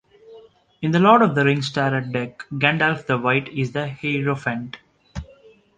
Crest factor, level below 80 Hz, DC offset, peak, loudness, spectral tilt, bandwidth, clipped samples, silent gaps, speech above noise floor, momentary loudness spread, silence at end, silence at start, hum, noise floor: 20 dB; -50 dBFS; under 0.1%; -2 dBFS; -20 LUFS; -6.5 dB/octave; 9.4 kHz; under 0.1%; none; 31 dB; 22 LU; 0.55 s; 0.3 s; none; -51 dBFS